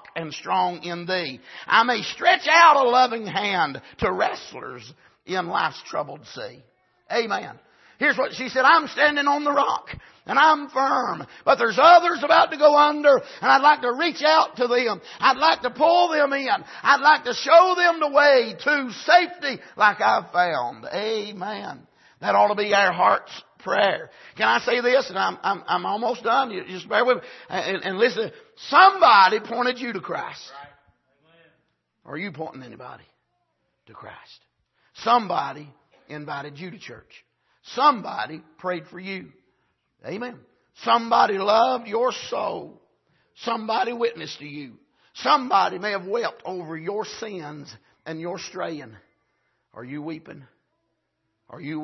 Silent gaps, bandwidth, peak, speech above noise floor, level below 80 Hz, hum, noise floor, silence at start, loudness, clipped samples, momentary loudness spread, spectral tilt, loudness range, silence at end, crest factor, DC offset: none; 6.2 kHz; -2 dBFS; 54 dB; -64 dBFS; none; -76 dBFS; 0.15 s; -20 LUFS; under 0.1%; 20 LU; -3.5 dB/octave; 15 LU; 0 s; 20 dB; under 0.1%